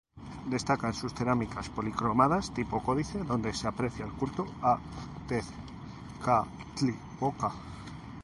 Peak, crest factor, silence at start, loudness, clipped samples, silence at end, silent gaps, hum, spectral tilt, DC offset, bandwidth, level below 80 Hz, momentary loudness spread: -10 dBFS; 22 dB; 0.15 s; -31 LUFS; under 0.1%; 0 s; none; none; -6 dB/octave; under 0.1%; 11.5 kHz; -50 dBFS; 15 LU